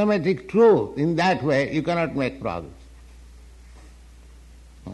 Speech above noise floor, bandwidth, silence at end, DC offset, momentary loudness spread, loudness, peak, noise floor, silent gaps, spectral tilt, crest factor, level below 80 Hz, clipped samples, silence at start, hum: 25 dB; 11 kHz; 0 s; under 0.1%; 15 LU; -21 LUFS; -8 dBFS; -46 dBFS; none; -7 dB/octave; 16 dB; -48 dBFS; under 0.1%; 0 s; none